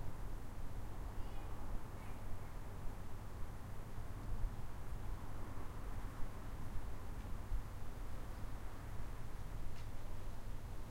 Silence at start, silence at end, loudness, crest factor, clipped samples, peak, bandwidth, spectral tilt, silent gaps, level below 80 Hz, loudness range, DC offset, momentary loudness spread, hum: 0 s; 0 s; -51 LUFS; 14 dB; under 0.1%; -26 dBFS; 15.5 kHz; -6 dB/octave; none; -46 dBFS; 1 LU; under 0.1%; 3 LU; none